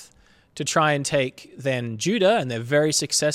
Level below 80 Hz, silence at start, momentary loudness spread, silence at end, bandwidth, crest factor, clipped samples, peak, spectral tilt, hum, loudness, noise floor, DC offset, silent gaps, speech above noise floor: -62 dBFS; 0 s; 8 LU; 0 s; 15.5 kHz; 16 dB; under 0.1%; -6 dBFS; -3.5 dB/octave; none; -22 LUFS; -56 dBFS; under 0.1%; none; 34 dB